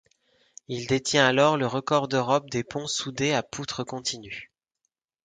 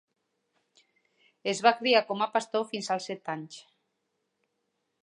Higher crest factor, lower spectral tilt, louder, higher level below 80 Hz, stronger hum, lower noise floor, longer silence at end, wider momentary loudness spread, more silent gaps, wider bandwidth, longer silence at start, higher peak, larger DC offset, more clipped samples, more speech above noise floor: about the same, 24 dB vs 24 dB; about the same, -4 dB/octave vs -3 dB/octave; first, -25 LUFS vs -28 LUFS; first, -62 dBFS vs -86 dBFS; neither; about the same, -81 dBFS vs -80 dBFS; second, 0.8 s vs 1.45 s; about the same, 14 LU vs 14 LU; neither; second, 9.6 kHz vs 11 kHz; second, 0.7 s vs 1.45 s; first, -4 dBFS vs -8 dBFS; neither; neither; about the same, 55 dB vs 52 dB